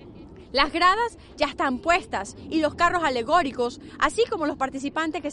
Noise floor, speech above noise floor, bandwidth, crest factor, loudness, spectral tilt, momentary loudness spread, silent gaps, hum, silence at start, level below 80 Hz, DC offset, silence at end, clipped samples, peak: -44 dBFS; 20 dB; 11.5 kHz; 20 dB; -24 LUFS; -3.5 dB/octave; 9 LU; none; none; 0 s; -46 dBFS; under 0.1%; 0 s; under 0.1%; -4 dBFS